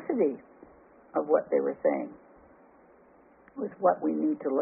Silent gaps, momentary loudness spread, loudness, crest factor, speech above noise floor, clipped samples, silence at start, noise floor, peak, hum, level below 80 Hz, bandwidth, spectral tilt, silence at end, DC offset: none; 13 LU; -29 LUFS; 20 dB; 31 dB; under 0.1%; 0 s; -58 dBFS; -10 dBFS; none; -74 dBFS; 2.7 kHz; -2.5 dB/octave; 0 s; under 0.1%